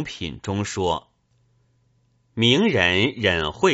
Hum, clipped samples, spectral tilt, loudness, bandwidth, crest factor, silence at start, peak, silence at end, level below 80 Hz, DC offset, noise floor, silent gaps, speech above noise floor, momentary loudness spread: none; under 0.1%; -3 dB/octave; -21 LUFS; 8 kHz; 20 dB; 0 s; -4 dBFS; 0 s; -48 dBFS; under 0.1%; -64 dBFS; none; 43 dB; 13 LU